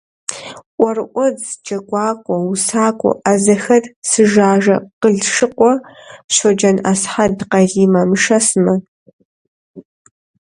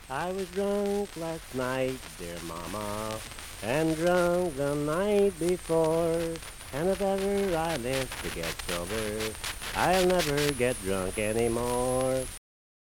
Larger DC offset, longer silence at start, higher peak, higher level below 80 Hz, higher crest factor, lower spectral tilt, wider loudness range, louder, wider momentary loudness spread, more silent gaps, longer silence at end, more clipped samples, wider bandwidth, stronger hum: neither; first, 0.3 s vs 0 s; first, 0 dBFS vs -8 dBFS; second, -54 dBFS vs -46 dBFS; second, 16 dB vs 22 dB; about the same, -4.5 dB/octave vs -4.5 dB/octave; about the same, 3 LU vs 5 LU; first, -14 LUFS vs -29 LUFS; about the same, 9 LU vs 11 LU; first, 0.66-0.78 s, 3.96-4.02 s, 4.93-5.01 s, 6.24-6.29 s, 8.88-9.06 s, 9.13-9.19 s, 9.25-9.74 s vs none; first, 0.7 s vs 0.45 s; neither; second, 11.5 kHz vs 19 kHz; neither